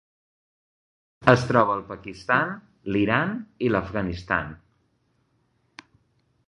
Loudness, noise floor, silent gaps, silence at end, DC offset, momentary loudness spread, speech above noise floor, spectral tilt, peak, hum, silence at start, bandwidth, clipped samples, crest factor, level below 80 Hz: -24 LUFS; -69 dBFS; none; 1.9 s; under 0.1%; 13 LU; 45 dB; -7 dB/octave; -2 dBFS; none; 1.2 s; 11 kHz; under 0.1%; 24 dB; -50 dBFS